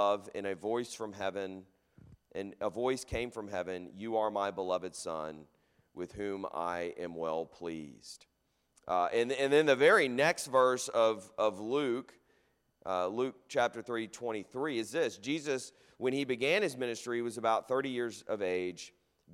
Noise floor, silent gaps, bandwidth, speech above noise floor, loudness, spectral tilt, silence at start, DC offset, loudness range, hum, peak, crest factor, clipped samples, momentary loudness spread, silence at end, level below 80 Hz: -74 dBFS; none; 15.5 kHz; 40 dB; -33 LUFS; -4 dB/octave; 0 s; under 0.1%; 10 LU; none; -12 dBFS; 22 dB; under 0.1%; 15 LU; 0 s; -66 dBFS